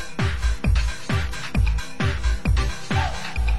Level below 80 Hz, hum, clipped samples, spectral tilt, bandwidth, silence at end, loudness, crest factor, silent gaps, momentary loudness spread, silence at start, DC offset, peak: -24 dBFS; none; under 0.1%; -5 dB/octave; 12 kHz; 0 s; -25 LUFS; 12 dB; none; 3 LU; 0 s; 3%; -10 dBFS